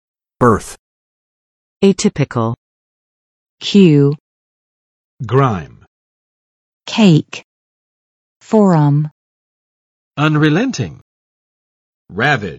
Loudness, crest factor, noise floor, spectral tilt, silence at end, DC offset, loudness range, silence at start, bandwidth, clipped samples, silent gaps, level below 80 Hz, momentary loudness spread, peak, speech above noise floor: -14 LUFS; 16 dB; under -90 dBFS; -6.5 dB/octave; 0 s; under 0.1%; 4 LU; 0.4 s; 11.5 kHz; under 0.1%; 0.79-1.80 s, 2.58-3.58 s, 4.20-5.18 s, 5.87-6.80 s, 7.44-8.40 s, 9.11-10.11 s, 11.01-12.05 s; -48 dBFS; 19 LU; 0 dBFS; over 78 dB